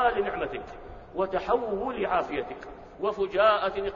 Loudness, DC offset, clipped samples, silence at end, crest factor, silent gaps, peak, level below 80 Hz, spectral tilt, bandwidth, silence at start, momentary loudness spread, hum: -27 LUFS; under 0.1%; under 0.1%; 0 s; 18 dB; none; -10 dBFS; -50 dBFS; -6 dB/octave; 7.2 kHz; 0 s; 18 LU; none